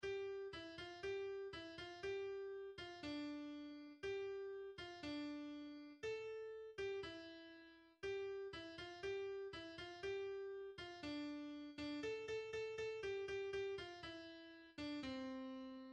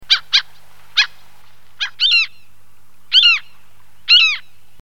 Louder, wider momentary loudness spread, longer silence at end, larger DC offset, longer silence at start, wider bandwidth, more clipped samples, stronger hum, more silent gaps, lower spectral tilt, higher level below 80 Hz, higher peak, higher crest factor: second, -50 LUFS vs -13 LUFS; second, 7 LU vs 15 LU; second, 0 s vs 0.4 s; second, under 0.1% vs 3%; about the same, 0 s vs 0 s; second, 9.4 kHz vs 17 kHz; neither; second, none vs 50 Hz at -60 dBFS; neither; first, -4.5 dB/octave vs 3 dB/octave; second, -74 dBFS vs -64 dBFS; second, -36 dBFS vs 0 dBFS; second, 12 dB vs 18 dB